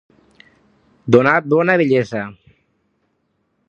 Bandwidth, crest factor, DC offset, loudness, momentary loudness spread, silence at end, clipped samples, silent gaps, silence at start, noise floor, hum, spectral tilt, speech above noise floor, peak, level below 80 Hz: 7.2 kHz; 18 dB; under 0.1%; -15 LUFS; 17 LU; 1.35 s; under 0.1%; none; 1.05 s; -67 dBFS; none; -7.5 dB/octave; 53 dB; 0 dBFS; -60 dBFS